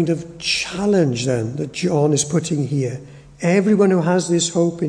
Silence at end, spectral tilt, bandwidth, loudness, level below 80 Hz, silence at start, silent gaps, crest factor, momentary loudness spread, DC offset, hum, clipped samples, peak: 0 s; -5 dB/octave; 10.5 kHz; -19 LUFS; -52 dBFS; 0 s; none; 16 dB; 8 LU; under 0.1%; none; under 0.1%; -4 dBFS